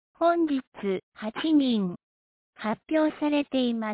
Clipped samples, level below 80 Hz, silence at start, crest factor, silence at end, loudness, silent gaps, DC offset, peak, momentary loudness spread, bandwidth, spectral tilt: under 0.1%; -68 dBFS; 0.2 s; 14 dB; 0 s; -27 LUFS; 0.67-0.72 s, 1.03-1.12 s, 2.03-2.53 s; under 0.1%; -14 dBFS; 10 LU; 4 kHz; -10 dB/octave